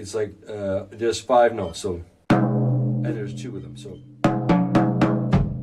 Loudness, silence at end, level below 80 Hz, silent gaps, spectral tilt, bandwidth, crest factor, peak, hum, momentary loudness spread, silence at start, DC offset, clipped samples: -22 LUFS; 0 s; -42 dBFS; none; -7 dB/octave; 11 kHz; 16 dB; -6 dBFS; none; 16 LU; 0 s; under 0.1%; under 0.1%